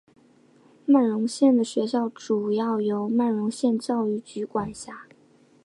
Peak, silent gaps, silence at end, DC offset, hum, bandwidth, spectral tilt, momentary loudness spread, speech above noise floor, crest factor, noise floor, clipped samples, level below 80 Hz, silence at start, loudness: -10 dBFS; none; 0.65 s; under 0.1%; none; 11.5 kHz; -6 dB/octave; 13 LU; 34 dB; 16 dB; -58 dBFS; under 0.1%; -66 dBFS; 0.85 s; -24 LUFS